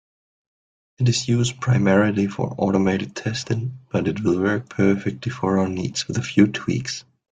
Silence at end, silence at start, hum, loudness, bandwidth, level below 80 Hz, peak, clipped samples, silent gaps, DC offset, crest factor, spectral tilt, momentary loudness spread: 0.4 s; 1 s; none; -22 LUFS; 9.4 kHz; -54 dBFS; -2 dBFS; under 0.1%; none; under 0.1%; 20 dB; -6 dB/octave; 8 LU